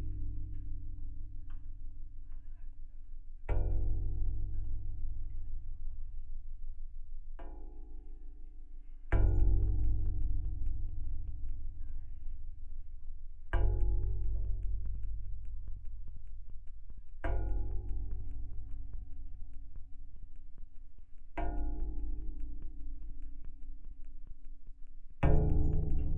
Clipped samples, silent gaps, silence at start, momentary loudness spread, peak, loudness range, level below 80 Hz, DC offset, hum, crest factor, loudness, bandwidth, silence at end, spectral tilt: under 0.1%; none; 0 s; 21 LU; -14 dBFS; 12 LU; -36 dBFS; under 0.1%; none; 20 dB; -40 LUFS; 3 kHz; 0 s; -10 dB/octave